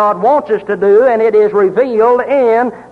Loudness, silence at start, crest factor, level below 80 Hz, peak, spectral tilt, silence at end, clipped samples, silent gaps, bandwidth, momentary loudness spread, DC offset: -11 LUFS; 0 s; 8 dB; -54 dBFS; -2 dBFS; -7.5 dB/octave; 0.1 s; under 0.1%; none; 4.8 kHz; 5 LU; under 0.1%